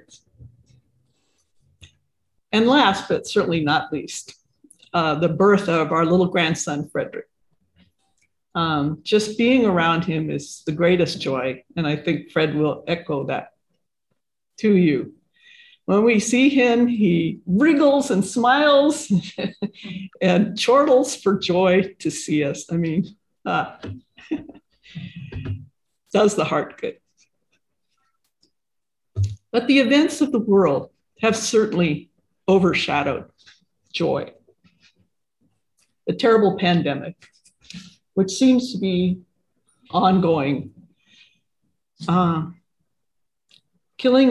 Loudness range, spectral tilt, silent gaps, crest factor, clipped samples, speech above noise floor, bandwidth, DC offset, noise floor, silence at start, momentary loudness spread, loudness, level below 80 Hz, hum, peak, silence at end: 7 LU; -5.5 dB/octave; none; 18 dB; under 0.1%; 66 dB; 12.5 kHz; under 0.1%; -85 dBFS; 0.45 s; 16 LU; -20 LUFS; -52 dBFS; none; -4 dBFS; 0 s